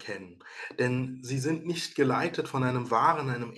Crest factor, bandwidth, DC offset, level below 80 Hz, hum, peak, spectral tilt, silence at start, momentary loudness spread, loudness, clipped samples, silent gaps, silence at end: 18 dB; 12.5 kHz; under 0.1%; -70 dBFS; none; -10 dBFS; -5.5 dB/octave; 0 s; 15 LU; -29 LUFS; under 0.1%; none; 0 s